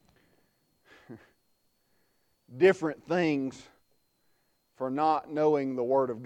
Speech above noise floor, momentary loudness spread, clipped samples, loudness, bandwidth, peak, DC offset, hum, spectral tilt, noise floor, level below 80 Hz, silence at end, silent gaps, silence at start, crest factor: 44 dB; 10 LU; under 0.1%; -28 LUFS; 9.2 kHz; -10 dBFS; under 0.1%; none; -7 dB/octave; -72 dBFS; -72 dBFS; 0 s; none; 1.1 s; 20 dB